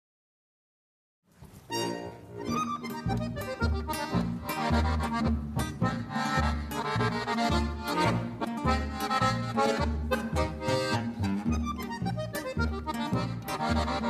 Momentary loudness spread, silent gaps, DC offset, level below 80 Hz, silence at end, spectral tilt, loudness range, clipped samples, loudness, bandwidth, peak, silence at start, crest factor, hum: 6 LU; none; under 0.1%; -38 dBFS; 0 s; -5.5 dB/octave; 5 LU; under 0.1%; -30 LUFS; 14.5 kHz; -12 dBFS; 1.4 s; 18 dB; none